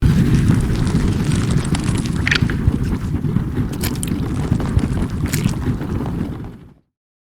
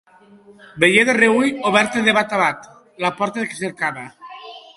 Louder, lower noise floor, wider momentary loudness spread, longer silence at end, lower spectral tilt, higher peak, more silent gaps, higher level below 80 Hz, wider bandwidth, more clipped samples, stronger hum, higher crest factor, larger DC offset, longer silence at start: about the same, -19 LUFS vs -17 LUFS; about the same, -39 dBFS vs -38 dBFS; second, 7 LU vs 21 LU; first, 0.6 s vs 0.15 s; first, -6 dB/octave vs -4 dB/octave; about the same, 0 dBFS vs 0 dBFS; neither; first, -26 dBFS vs -60 dBFS; first, 17.5 kHz vs 11.5 kHz; neither; neither; about the same, 18 dB vs 20 dB; neither; second, 0 s vs 0.75 s